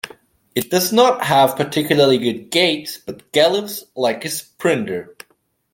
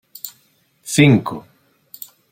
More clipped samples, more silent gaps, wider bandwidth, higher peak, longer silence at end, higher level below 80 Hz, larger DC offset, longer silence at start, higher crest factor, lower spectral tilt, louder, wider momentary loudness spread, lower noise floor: neither; neither; about the same, 17 kHz vs 17 kHz; about the same, -2 dBFS vs -2 dBFS; second, 0.6 s vs 0.9 s; second, -62 dBFS vs -56 dBFS; neither; second, 0.05 s vs 0.25 s; about the same, 16 dB vs 18 dB; second, -4 dB/octave vs -5.5 dB/octave; about the same, -17 LUFS vs -15 LUFS; second, 13 LU vs 24 LU; second, -47 dBFS vs -59 dBFS